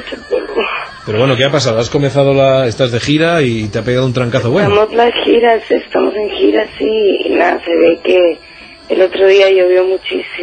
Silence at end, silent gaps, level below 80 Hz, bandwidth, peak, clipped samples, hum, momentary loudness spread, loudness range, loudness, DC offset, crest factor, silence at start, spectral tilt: 0 s; none; -44 dBFS; 9.2 kHz; 0 dBFS; under 0.1%; none; 8 LU; 1 LU; -12 LUFS; under 0.1%; 12 dB; 0 s; -6 dB/octave